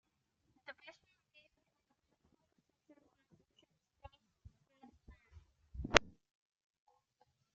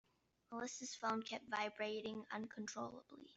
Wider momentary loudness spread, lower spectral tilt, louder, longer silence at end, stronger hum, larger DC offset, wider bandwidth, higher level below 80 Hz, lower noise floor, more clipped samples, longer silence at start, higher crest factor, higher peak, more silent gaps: first, 26 LU vs 8 LU; second, -1 dB/octave vs -3 dB/octave; first, -34 LUFS vs -46 LUFS; first, 1.5 s vs 0 s; neither; neither; about the same, 7.6 kHz vs 8.2 kHz; first, -60 dBFS vs -86 dBFS; first, -82 dBFS vs -68 dBFS; neither; first, 0.7 s vs 0.5 s; first, 46 dB vs 22 dB; first, 0 dBFS vs -26 dBFS; neither